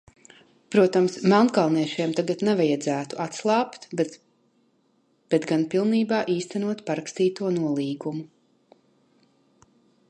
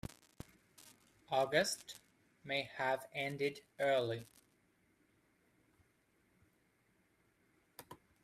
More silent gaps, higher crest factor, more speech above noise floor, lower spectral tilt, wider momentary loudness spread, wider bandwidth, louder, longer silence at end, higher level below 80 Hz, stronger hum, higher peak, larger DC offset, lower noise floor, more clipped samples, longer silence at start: neither; second, 18 dB vs 24 dB; first, 43 dB vs 38 dB; first, -6 dB/octave vs -3.5 dB/octave; second, 10 LU vs 24 LU; second, 10.5 kHz vs 15.5 kHz; first, -24 LUFS vs -38 LUFS; first, 1.85 s vs 0.3 s; about the same, -74 dBFS vs -74 dBFS; neither; first, -6 dBFS vs -18 dBFS; neither; second, -66 dBFS vs -76 dBFS; neither; about the same, 0.7 s vs 0.8 s